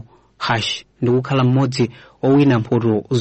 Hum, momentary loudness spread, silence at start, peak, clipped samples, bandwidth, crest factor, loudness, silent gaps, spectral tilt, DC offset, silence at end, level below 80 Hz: none; 8 LU; 0.4 s; -4 dBFS; under 0.1%; 8.6 kHz; 12 dB; -18 LUFS; none; -6.5 dB/octave; under 0.1%; 0 s; -52 dBFS